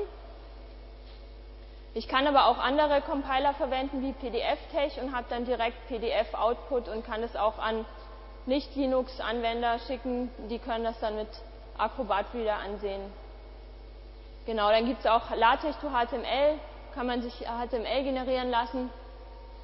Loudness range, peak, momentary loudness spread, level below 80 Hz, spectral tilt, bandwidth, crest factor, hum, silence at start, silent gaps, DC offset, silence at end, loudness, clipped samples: 5 LU; -8 dBFS; 23 LU; -46 dBFS; -8.5 dB/octave; 5.8 kHz; 22 dB; none; 0 s; none; under 0.1%; 0 s; -30 LUFS; under 0.1%